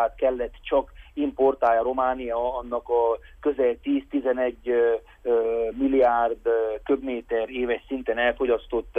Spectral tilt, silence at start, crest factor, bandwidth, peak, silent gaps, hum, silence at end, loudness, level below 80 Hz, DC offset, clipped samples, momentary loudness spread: -7 dB/octave; 0 s; 14 dB; 3.7 kHz; -10 dBFS; none; none; 0 s; -25 LUFS; -48 dBFS; under 0.1%; under 0.1%; 7 LU